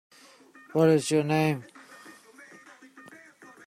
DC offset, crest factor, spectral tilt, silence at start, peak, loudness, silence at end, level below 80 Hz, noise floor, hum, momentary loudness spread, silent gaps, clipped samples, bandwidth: under 0.1%; 18 dB; -6 dB/octave; 0.75 s; -10 dBFS; -25 LUFS; 0.65 s; -70 dBFS; -54 dBFS; none; 26 LU; none; under 0.1%; 16 kHz